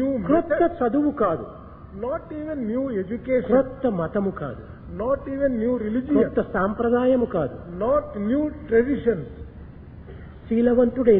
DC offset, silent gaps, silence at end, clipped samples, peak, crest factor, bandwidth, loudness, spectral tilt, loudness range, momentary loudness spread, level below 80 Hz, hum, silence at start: under 0.1%; none; 0 s; under 0.1%; -4 dBFS; 18 dB; 3.9 kHz; -23 LUFS; -12 dB/octave; 3 LU; 19 LU; -44 dBFS; none; 0 s